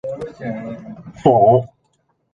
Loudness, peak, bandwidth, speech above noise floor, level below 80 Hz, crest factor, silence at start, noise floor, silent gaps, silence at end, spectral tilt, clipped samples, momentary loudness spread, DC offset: -16 LUFS; -2 dBFS; 7.4 kHz; 49 dB; -52 dBFS; 16 dB; 0.05 s; -65 dBFS; none; 0.7 s; -9 dB/octave; under 0.1%; 22 LU; under 0.1%